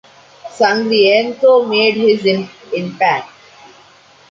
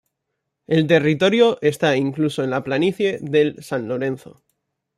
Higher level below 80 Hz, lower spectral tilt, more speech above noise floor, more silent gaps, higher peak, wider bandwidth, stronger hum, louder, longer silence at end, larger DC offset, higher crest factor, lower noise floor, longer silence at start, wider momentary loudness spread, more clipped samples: about the same, -64 dBFS vs -62 dBFS; about the same, -5 dB/octave vs -6 dB/octave; second, 33 dB vs 59 dB; neither; about the same, -2 dBFS vs -2 dBFS; second, 7.8 kHz vs 14 kHz; neither; first, -14 LUFS vs -19 LUFS; first, 1.05 s vs 0.8 s; neither; about the same, 14 dB vs 18 dB; second, -45 dBFS vs -78 dBFS; second, 0.45 s vs 0.7 s; first, 12 LU vs 9 LU; neither